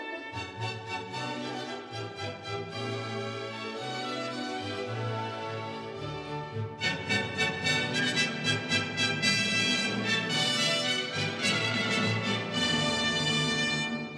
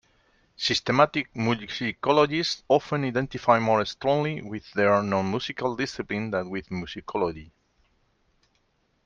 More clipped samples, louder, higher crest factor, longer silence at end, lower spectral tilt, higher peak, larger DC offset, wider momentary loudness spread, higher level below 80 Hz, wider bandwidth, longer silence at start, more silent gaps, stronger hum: neither; second, -29 LUFS vs -25 LUFS; about the same, 20 dB vs 22 dB; second, 0 s vs 1.6 s; second, -3.5 dB/octave vs -5.5 dB/octave; second, -12 dBFS vs -4 dBFS; neither; about the same, 12 LU vs 11 LU; second, -64 dBFS vs -58 dBFS; first, 11 kHz vs 7.6 kHz; second, 0 s vs 0.6 s; neither; neither